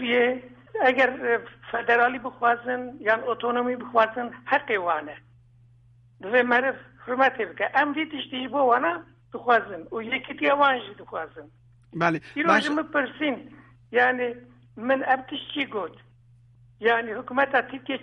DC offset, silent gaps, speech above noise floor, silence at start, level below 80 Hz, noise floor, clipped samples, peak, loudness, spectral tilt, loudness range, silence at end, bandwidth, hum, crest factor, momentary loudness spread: under 0.1%; none; 31 dB; 0 s; -66 dBFS; -56 dBFS; under 0.1%; -6 dBFS; -24 LUFS; -5 dB/octave; 3 LU; 0 s; 9.6 kHz; none; 20 dB; 14 LU